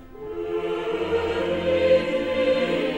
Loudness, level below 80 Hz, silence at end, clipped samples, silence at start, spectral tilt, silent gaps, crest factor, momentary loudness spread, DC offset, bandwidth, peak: -23 LUFS; -50 dBFS; 0 s; under 0.1%; 0 s; -6 dB/octave; none; 16 dB; 9 LU; under 0.1%; 9.6 kHz; -8 dBFS